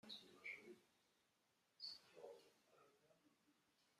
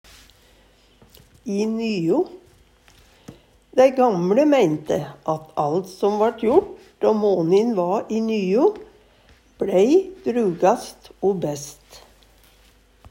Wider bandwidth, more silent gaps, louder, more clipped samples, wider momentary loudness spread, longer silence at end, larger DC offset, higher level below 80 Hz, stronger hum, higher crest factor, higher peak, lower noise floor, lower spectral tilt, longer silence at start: second, 13.5 kHz vs 16 kHz; neither; second, -58 LUFS vs -20 LUFS; neither; about the same, 11 LU vs 12 LU; second, 0 s vs 1.15 s; neither; second, under -90 dBFS vs -58 dBFS; neither; about the same, 20 dB vs 18 dB; second, -42 dBFS vs -4 dBFS; first, -85 dBFS vs -55 dBFS; second, -2 dB/octave vs -6.5 dB/octave; second, 0.05 s vs 1.45 s